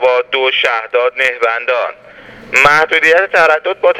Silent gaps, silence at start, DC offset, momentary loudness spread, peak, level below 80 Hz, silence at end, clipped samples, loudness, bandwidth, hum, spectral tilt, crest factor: none; 0 s; under 0.1%; 7 LU; 0 dBFS; -50 dBFS; 0 s; 0.2%; -11 LUFS; 15.5 kHz; none; -2 dB/octave; 12 dB